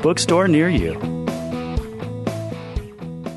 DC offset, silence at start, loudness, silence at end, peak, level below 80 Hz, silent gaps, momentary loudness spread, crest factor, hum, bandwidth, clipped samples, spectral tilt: under 0.1%; 0 s; -21 LUFS; 0 s; -4 dBFS; -34 dBFS; none; 15 LU; 16 dB; none; 12.5 kHz; under 0.1%; -5.5 dB/octave